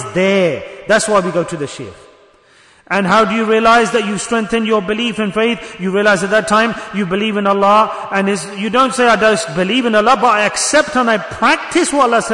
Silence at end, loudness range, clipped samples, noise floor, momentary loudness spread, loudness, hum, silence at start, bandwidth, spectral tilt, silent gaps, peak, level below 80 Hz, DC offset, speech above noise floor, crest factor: 0 s; 3 LU; under 0.1%; -48 dBFS; 8 LU; -13 LUFS; none; 0 s; 11 kHz; -4 dB/octave; none; -2 dBFS; -48 dBFS; under 0.1%; 34 dB; 12 dB